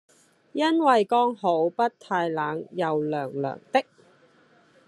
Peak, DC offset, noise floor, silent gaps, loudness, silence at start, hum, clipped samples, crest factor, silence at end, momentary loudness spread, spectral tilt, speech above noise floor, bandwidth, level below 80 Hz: -6 dBFS; under 0.1%; -59 dBFS; none; -25 LUFS; 0.55 s; none; under 0.1%; 20 dB; 1.05 s; 10 LU; -6 dB/octave; 35 dB; 11.5 kHz; -78 dBFS